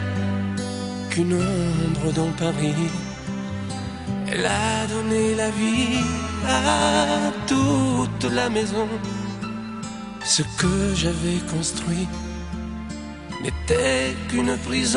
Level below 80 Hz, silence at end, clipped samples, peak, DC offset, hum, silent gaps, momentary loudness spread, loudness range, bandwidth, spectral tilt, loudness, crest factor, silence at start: -40 dBFS; 0 s; under 0.1%; -4 dBFS; under 0.1%; none; none; 11 LU; 4 LU; 11 kHz; -4.5 dB/octave; -23 LUFS; 20 dB; 0 s